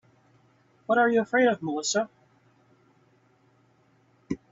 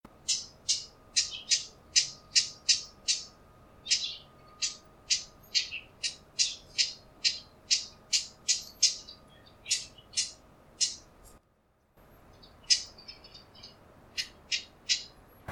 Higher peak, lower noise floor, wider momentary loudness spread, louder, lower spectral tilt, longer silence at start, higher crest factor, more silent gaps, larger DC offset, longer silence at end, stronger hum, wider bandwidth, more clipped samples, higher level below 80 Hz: about the same, -10 dBFS vs -8 dBFS; second, -64 dBFS vs -69 dBFS; second, 15 LU vs 19 LU; first, -25 LUFS vs -30 LUFS; first, -3.5 dB/octave vs 2 dB/octave; first, 0.9 s vs 0.25 s; second, 20 dB vs 28 dB; neither; neither; first, 0.15 s vs 0 s; neither; second, 7.8 kHz vs 18 kHz; neither; about the same, -68 dBFS vs -64 dBFS